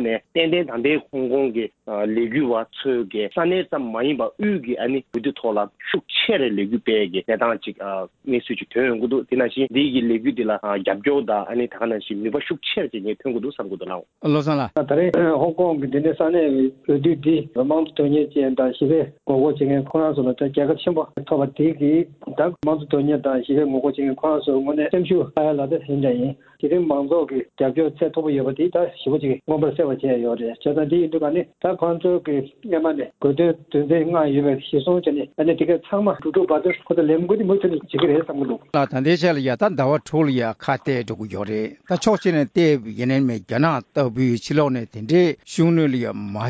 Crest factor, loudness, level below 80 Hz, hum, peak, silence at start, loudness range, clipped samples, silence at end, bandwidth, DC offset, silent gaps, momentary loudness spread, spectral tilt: 16 dB; -21 LUFS; -58 dBFS; none; -4 dBFS; 0 s; 3 LU; under 0.1%; 0 s; 8 kHz; under 0.1%; none; 6 LU; -7 dB/octave